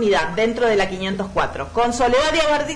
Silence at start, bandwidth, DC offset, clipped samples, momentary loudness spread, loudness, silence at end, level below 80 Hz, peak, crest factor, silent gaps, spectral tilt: 0 s; 10.5 kHz; under 0.1%; under 0.1%; 6 LU; -19 LUFS; 0 s; -38 dBFS; -10 dBFS; 10 dB; none; -4 dB/octave